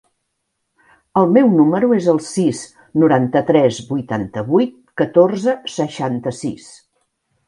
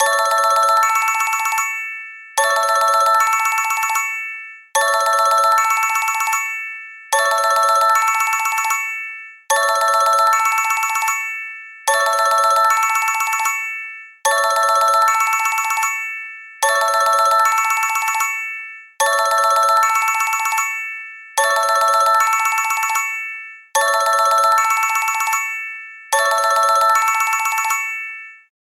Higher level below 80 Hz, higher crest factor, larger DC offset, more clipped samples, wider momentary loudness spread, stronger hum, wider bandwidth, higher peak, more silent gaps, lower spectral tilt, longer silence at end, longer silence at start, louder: first, -58 dBFS vs -74 dBFS; about the same, 16 dB vs 12 dB; neither; neither; about the same, 11 LU vs 12 LU; neither; second, 11.5 kHz vs 16.5 kHz; first, 0 dBFS vs -4 dBFS; neither; first, -6.5 dB/octave vs 4 dB/octave; first, 0.9 s vs 0.25 s; first, 1.15 s vs 0 s; about the same, -16 LUFS vs -16 LUFS